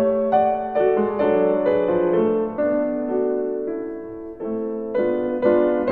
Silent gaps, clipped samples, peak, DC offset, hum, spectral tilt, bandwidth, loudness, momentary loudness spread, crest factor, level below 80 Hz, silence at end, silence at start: none; under 0.1%; -6 dBFS; under 0.1%; none; -10 dB/octave; 4.3 kHz; -21 LUFS; 10 LU; 16 dB; -54 dBFS; 0 s; 0 s